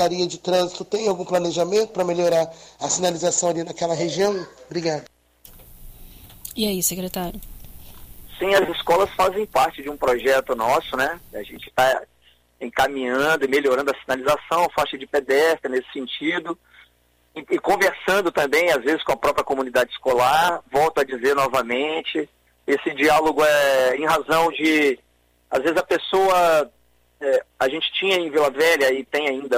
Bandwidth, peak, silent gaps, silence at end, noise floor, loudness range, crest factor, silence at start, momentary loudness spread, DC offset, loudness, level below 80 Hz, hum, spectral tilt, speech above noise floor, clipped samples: 16 kHz; -6 dBFS; none; 0 s; -61 dBFS; 6 LU; 16 dB; 0 s; 11 LU; under 0.1%; -21 LUFS; -50 dBFS; none; -3 dB/octave; 40 dB; under 0.1%